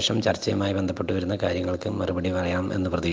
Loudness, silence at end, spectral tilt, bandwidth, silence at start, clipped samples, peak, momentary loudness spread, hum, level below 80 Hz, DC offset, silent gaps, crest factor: -26 LUFS; 0 s; -5.5 dB/octave; 9.8 kHz; 0 s; under 0.1%; -8 dBFS; 3 LU; none; -54 dBFS; under 0.1%; none; 18 dB